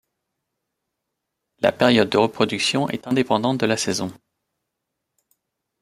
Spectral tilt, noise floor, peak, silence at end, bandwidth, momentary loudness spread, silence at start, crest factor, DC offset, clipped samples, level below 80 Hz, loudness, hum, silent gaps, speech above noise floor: -4.5 dB/octave; -80 dBFS; -2 dBFS; 1.7 s; 15.5 kHz; 7 LU; 1.6 s; 22 dB; under 0.1%; under 0.1%; -62 dBFS; -20 LUFS; none; none; 60 dB